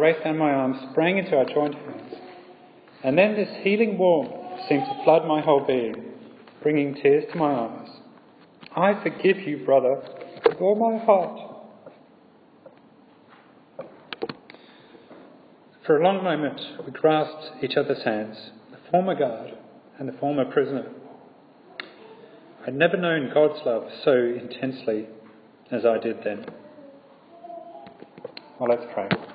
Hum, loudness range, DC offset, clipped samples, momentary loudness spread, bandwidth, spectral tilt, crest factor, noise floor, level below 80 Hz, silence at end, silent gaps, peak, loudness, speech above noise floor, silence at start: none; 8 LU; under 0.1%; under 0.1%; 21 LU; 5 kHz; -10 dB/octave; 24 dB; -54 dBFS; -74 dBFS; 0 s; none; -2 dBFS; -23 LUFS; 31 dB; 0 s